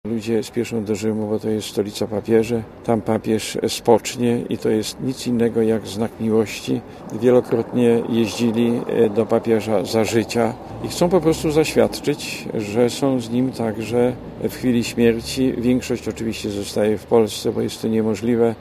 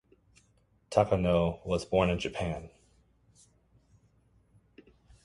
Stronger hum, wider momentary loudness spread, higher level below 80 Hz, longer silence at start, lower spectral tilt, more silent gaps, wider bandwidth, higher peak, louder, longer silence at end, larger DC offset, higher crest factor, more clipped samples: neither; second, 7 LU vs 10 LU; about the same, -46 dBFS vs -50 dBFS; second, 0.05 s vs 0.9 s; about the same, -5.5 dB/octave vs -6.5 dB/octave; neither; first, 15.5 kHz vs 11.5 kHz; first, 0 dBFS vs -8 dBFS; first, -20 LUFS vs -30 LUFS; second, 0 s vs 2.6 s; neither; second, 18 dB vs 24 dB; neither